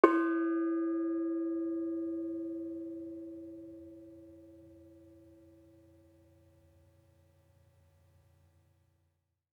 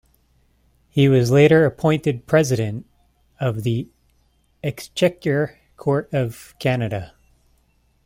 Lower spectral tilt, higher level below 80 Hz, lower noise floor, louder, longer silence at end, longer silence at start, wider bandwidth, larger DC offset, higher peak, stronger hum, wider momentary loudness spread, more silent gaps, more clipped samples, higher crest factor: about the same, -7.5 dB/octave vs -6.5 dB/octave; second, -80 dBFS vs -52 dBFS; first, -79 dBFS vs -62 dBFS; second, -35 LUFS vs -20 LUFS; first, 4.4 s vs 1 s; second, 0.05 s vs 0.95 s; second, 4.9 kHz vs 16 kHz; neither; second, -6 dBFS vs -2 dBFS; neither; first, 25 LU vs 15 LU; neither; neither; first, 30 dB vs 18 dB